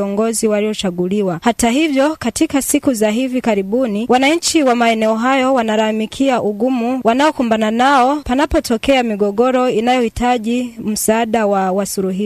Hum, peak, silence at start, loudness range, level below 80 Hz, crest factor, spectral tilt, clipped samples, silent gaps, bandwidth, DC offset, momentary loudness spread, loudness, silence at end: none; -2 dBFS; 0 s; 1 LU; -40 dBFS; 14 dB; -4 dB/octave; under 0.1%; none; 16 kHz; under 0.1%; 5 LU; -15 LUFS; 0 s